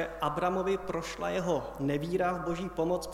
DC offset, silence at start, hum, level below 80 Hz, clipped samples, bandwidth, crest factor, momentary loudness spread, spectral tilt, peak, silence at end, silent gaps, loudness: under 0.1%; 0 s; none; -52 dBFS; under 0.1%; 16 kHz; 18 dB; 4 LU; -6 dB/octave; -14 dBFS; 0 s; none; -32 LUFS